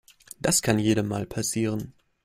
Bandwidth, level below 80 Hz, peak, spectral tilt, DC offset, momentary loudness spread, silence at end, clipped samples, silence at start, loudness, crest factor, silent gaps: 16 kHz; -54 dBFS; -4 dBFS; -4 dB/octave; under 0.1%; 10 LU; 0.35 s; under 0.1%; 0.45 s; -25 LUFS; 22 dB; none